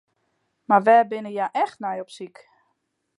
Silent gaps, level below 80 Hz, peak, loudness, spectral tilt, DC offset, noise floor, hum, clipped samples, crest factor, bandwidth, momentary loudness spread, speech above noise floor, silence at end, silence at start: none; -82 dBFS; -4 dBFS; -21 LUFS; -6 dB/octave; under 0.1%; -74 dBFS; none; under 0.1%; 20 dB; 11 kHz; 22 LU; 53 dB; 0.9 s; 0.7 s